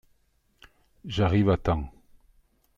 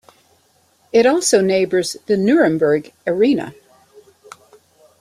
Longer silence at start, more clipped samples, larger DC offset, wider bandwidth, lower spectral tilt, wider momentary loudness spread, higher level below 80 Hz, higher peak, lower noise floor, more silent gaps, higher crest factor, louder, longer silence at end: about the same, 1.05 s vs 0.95 s; neither; neither; second, 7.4 kHz vs 13.5 kHz; first, -8 dB/octave vs -4.5 dB/octave; first, 19 LU vs 7 LU; first, -44 dBFS vs -60 dBFS; second, -8 dBFS vs -2 dBFS; first, -68 dBFS vs -58 dBFS; neither; about the same, 20 dB vs 16 dB; second, -26 LUFS vs -16 LUFS; second, 0.9 s vs 1.5 s